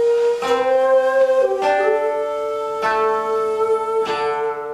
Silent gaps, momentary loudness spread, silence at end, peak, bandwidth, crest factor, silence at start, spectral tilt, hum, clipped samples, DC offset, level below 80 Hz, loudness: none; 7 LU; 0 s; -4 dBFS; 12.5 kHz; 14 dB; 0 s; -3.5 dB/octave; none; under 0.1%; under 0.1%; -60 dBFS; -18 LUFS